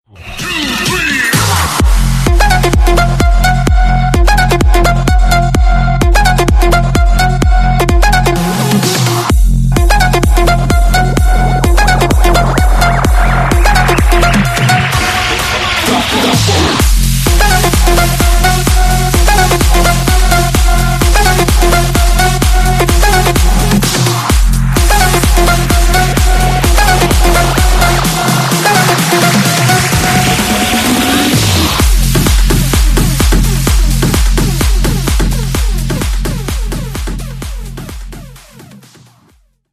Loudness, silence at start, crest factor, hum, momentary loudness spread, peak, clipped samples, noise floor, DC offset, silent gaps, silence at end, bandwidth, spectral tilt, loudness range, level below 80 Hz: -10 LUFS; 0.2 s; 8 dB; none; 4 LU; 0 dBFS; under 0.1%; -50 dBFS; under 0.1%; none; 0.95 s; 15 kHz; -4 dB/octave; 3 LU; -12 dBFS